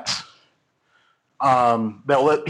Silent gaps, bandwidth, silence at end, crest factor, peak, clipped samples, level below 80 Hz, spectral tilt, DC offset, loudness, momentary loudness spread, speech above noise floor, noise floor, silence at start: none; 11.5 kHz; 0 s; 16 dB; -6 dBFS; under 0.1%; -64 dBFS; -4.5 dB/octave; under 0.1%; -20 LUFS; 9 LU; 47 dB; -66 dBFS; 0 s